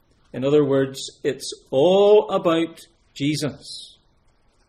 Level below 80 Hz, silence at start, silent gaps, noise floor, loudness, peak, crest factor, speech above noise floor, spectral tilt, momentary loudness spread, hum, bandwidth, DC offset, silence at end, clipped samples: -60 dBFS; 0.35 s; none; -60 dBFS; -20 LUFS; -6 dBFS; 16 dB; 40 dB; -5.5 dB/octave; 18 LU; none; 14.5 kHz; under 0.1%; 0.8 s; under 0.1%